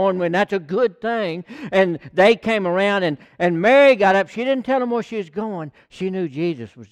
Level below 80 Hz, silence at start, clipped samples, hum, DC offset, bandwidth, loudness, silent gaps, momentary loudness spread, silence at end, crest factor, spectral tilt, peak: -60 dBFS; 0 s; under 0.1%; none; under 0.1%; 10 kHz; -19 LUFS; none; 14 LU; 0.05 s; 16 dB; -6.5 dB/octave; -4 dBFS